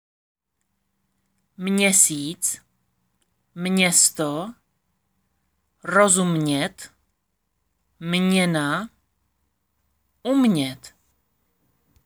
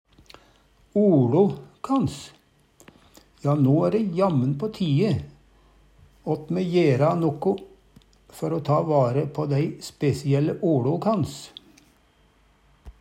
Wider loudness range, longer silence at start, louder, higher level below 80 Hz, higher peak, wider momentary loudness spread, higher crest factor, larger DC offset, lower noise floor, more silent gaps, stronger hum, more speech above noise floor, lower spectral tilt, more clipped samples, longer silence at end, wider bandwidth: first, 6 LU vs 2 LU; first, 1.6 s vs 0.95 s; first, -20 LUFS vs -23 LUFS; second, -66 dBFS vs -56 dBFS; first, -2 dBFS vs -8 dBFS; first, 18 LU vs 11 LU; first, 22 dB vs 16 dB; neither; first, -76 dBFS vs -60 dBFS; neither; neither; first, 55 dB vs 38 dB; second, -3.5 dB/octave vs -8 dB/octave; neither; first, 1.2 s vs 0.1 s; first, over 20 kHz vs 14.5 kHz